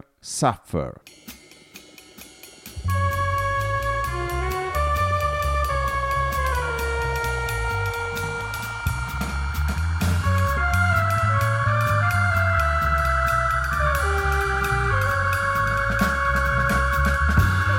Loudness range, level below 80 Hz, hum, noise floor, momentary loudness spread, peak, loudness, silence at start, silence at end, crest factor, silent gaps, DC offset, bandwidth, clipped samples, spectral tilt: 6 LU; -30 dBFS; none; -47 dBFS; 8 LU; -6 dBFS; -22 LUFS; 0.25 s; 0 s; 16 dB; none; under 0.1%; 17 kHz; under 0.1%; -5 dB/octave